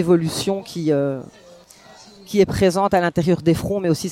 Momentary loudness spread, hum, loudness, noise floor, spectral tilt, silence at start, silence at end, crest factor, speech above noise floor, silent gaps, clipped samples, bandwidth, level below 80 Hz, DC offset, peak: 7 LU; none; -19 LUFS; -46 dBFS; -6 dB/octave; 0 s; 0 s; 16 dB; 27 dB; none; under 0.1%; 16.5 kHz; -46 dBFS; under 0.1%; -4 dBFS